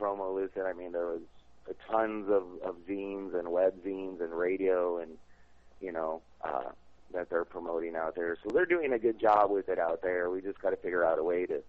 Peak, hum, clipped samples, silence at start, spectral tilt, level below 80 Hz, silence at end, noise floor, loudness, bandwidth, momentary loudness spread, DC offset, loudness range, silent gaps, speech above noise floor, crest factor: -12 dBFS; none; under 0.1%; 0 s; -7.5 dB/octave; -64 dBFS; 0.05 s; -60 dBFS; -32 LUFS; 6.2 kHz; 11 LU; 0.1%; 6 LU; none; 28 dB; 20 dB